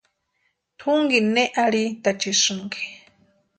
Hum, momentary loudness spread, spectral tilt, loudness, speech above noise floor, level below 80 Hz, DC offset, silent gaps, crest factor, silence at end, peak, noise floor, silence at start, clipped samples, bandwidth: none; 12 LU; -2.5 dB/octave; -21 LUFS; 50 dB; -68 dBFS; under 0.1%; none; 18 dB; 0.6 s; -6 dBFS; -72 dBFS; 0.8 s; under 0.1%; 9.4 kHz